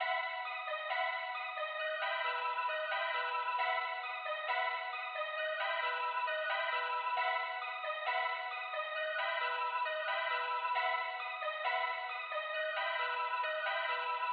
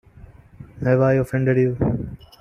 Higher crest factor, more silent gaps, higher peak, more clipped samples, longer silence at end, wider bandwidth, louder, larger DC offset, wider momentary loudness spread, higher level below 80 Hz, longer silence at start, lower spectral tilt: about the same, 14 dB vs 16 dB; neither; second, -22 dBFS vs -6 dBFS; neither; second, 0 s vs 0.25 s; second, 5.2 kHz vs 10 kHz; second, -36 LUFS vs -20 LUFS; neither; second, 4 LU vs 10 LU; second, under -90 dBFS vs -42 dBFS; second, 0 s vs 0.6 s; second, 11.5 dB/octave vs -9.5 dB/octave